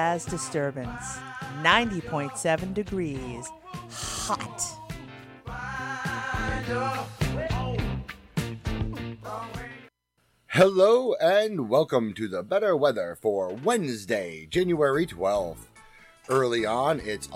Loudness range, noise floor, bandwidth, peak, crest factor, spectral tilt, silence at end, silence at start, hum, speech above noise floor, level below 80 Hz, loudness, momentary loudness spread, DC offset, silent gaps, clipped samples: 9 LU; -70 dBFS; 16.5 kHz; -4 dBFS; 22 dB; -4.5 dB/octave; 0 s; 0 s; none; 44 dB; -44 dBFS; -27 LUFS; 15 LU; under 0.1%; none; under 0.1%